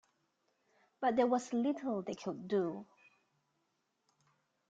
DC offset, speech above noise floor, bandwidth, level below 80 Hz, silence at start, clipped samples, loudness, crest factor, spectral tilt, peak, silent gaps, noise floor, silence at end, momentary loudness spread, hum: under 0.1%; 47 dB; 9 kHz; -82 dBFS; 1 s; under 0.1%; -36 LUFS; 20 dB; -6 dB/octave; -20 dBFS; none; -82 dBFS; 1.85 s; 10 LU; none